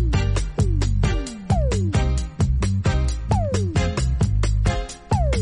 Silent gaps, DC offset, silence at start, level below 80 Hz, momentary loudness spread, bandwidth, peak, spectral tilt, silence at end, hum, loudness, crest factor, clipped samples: none; under 0.1%; 0 s; -24 dBFS; 3 LU; 11 kHz; -6 dBFS; -6 dB/octave; 0 s; none; -22 LUFS; 14 dB; under 0.1%